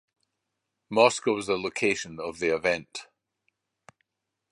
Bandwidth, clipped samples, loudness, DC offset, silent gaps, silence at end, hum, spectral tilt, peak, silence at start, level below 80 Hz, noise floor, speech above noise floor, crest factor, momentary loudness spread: 11.5 kHz; under 0.1%; -26 LUFS; under 0.1%; none; 1.5 s; none; -3.5 dB/octave; -4 dBFS; 0.9 s; -64 dBFS; -84 dBFS; 58 dB; 24 dB; 13 LU